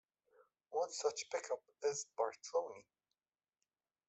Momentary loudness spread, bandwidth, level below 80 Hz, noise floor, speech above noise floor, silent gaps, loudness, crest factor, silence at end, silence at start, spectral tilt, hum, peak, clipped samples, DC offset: 7 LU; 8.2 kHz; under -90 dBFS; under -90 dBFS; over 48 dB; none; -42 LUFS; 20 dB; 1.3 s; 0.7 s; -1 dB/octave; none; -22 dBFS; under 0.1%; under 0.1%